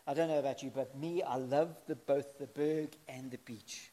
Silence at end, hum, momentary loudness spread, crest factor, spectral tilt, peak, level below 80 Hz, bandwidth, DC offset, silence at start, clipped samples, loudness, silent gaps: 0.05 s; none; 13 LU; 18 dB; -5.5 dB/octave; -18 dBFS; -82 dBFS; 15 kHz; under 0.1%; 0.05 s; under 0.1%; -37 LUFS; none